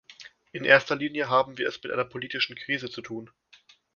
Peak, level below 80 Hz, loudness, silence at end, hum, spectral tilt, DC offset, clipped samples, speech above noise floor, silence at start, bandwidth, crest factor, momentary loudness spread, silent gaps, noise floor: -2 dBFS; -68 dBFS; -26 LUFS; 0.7 s; none; -4.5 dB/octave; under 0.1%; under 0.1%; 32 dB; 0.1 s; 7.2 kHz; 28 dB; 19 LU; none; -59 dBFS